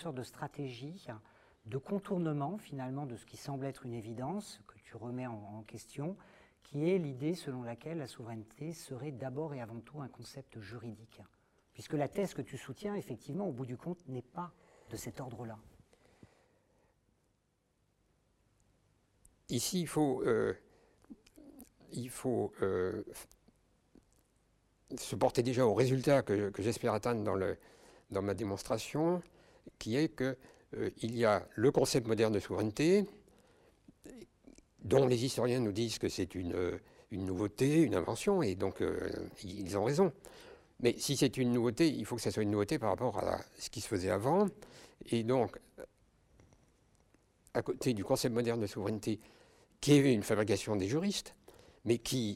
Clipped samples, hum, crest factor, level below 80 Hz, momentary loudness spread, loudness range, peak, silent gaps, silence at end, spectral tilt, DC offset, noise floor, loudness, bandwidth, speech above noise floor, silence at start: under 0.1%; none; 20 dB; -64 dBFS; 18 LU; 11 LU; -16 dBFS; none; 0 s; -5.5 dB/octave; under 0.1%; -78 dBFS; -35 LUFS; 16 kHz; 43 dB; 0 s